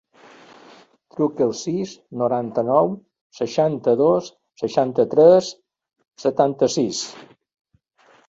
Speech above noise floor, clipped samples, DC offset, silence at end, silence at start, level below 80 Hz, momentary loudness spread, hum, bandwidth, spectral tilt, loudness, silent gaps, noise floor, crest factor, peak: 38 dB; under 0.1%; under 0.1%; 1.05 s; 1.15 s; -64 dBFS; 16 LU; none; 8 kHz; -5.5 dB/octave; -20 LUFS; 3.21-3.30 s; -57 dBFS; 18 dB; -2 dBFS